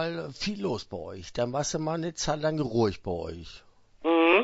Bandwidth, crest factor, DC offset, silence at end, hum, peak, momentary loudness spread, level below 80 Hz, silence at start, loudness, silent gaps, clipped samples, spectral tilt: 8 kHz; 20 dB; under 0.1%; 0 s; none; -8 dBFS; 12 LU; -52 dBFS; 0 s; -29 LUFS; none; under 0.1%; -4.5 dB/octave